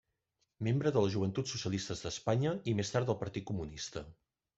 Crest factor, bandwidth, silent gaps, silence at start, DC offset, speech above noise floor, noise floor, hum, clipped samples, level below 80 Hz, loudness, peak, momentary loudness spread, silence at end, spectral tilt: 20 dB; 8 kHz; none; 0.6 s; under 0.1%; 48 dB; -82 dBFS; none; under 0.1%; -62 dBFS; -35 LUFS; -16 dBFS; 10 LU; 0.45 s; -5.5 dB/octave